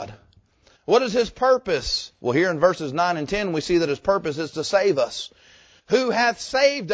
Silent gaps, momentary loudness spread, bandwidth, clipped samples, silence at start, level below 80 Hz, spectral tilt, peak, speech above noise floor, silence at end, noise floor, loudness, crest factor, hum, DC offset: none; 7 LU; 8 kHz; under 0.1%; 0 s; -50 dBFS; -4.5 dB/octave; -4 dBFS; 36 dB; 0 s; -58 dBFS; -22 LUFS; 18 dB; none; under 0.1%